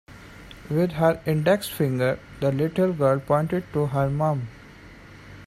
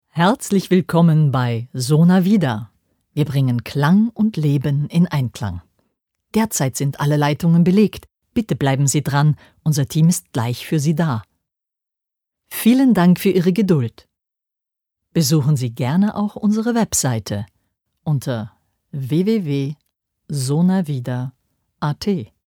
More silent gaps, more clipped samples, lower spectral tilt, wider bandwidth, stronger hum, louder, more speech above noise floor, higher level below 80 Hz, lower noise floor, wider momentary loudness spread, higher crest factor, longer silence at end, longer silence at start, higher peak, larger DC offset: neither; neither; about the same, -7 dB/octave vs -6 dB/octave; second, 15.5 kHz vs 19.5 kHz; neither; second, -24 LUFS vs -18 LUFS; second, 23 dB vs 65 dB; about the same, -50 dBFS vs -54 dBFS; second, -46 dBFS vs -82 dBFS; about the same, 14 LU vs 13 LU; about the same, 18 dB vs 16 dB; second, 0 s vs 0.2 s; about the same, 0.1 s vs 0.15 s; second, -6 dBFS vs -2 dBFS; neither